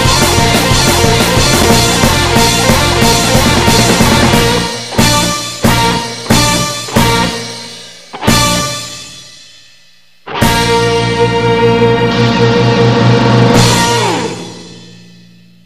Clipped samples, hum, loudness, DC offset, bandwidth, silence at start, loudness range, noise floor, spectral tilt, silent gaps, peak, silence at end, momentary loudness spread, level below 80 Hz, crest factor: 0.3%; none; -9 LUFS; 0.6%; 16 kHz; 0 s; 6 LU; -47 dBFS; -4 dB/octave; none; 0 dBFS; 0.75 s; 12 LU; -24 dBFS; 10 dB